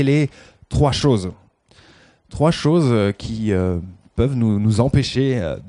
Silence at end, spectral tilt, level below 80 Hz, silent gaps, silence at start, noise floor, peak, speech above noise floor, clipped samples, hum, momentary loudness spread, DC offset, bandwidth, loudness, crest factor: 0 s; -7 dB/octave; -36 dBFS; none; 0 s; -51 dBFS; -2 dBFS; 34 dB; under 0.1%; none; 10 LU; under 0.1%; 10.5 kHz; -19 LUFS; 16 dB